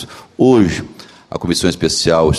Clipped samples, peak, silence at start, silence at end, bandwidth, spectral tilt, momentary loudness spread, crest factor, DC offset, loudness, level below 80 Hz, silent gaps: under 0.1%; 0 dBFS; 0 s; 0 s; 13 kHz; -5 dB/octave; 18 LU; 14 dB; under 0.1%; -14 LUFS; -36 dBFS; none